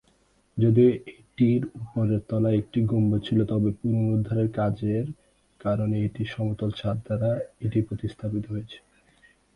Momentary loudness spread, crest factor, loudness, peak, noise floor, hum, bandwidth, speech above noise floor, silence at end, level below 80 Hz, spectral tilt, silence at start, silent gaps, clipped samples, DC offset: 11 LU; 16 dB; -26 LUFS; -10 dBFS; -64 dBFS; none; 5.2 kHz; 39 dB; 0.8 s; -52 dBFS; -9.5 dB/octave; 0.55 s; none; under 0.1%; under 0.1%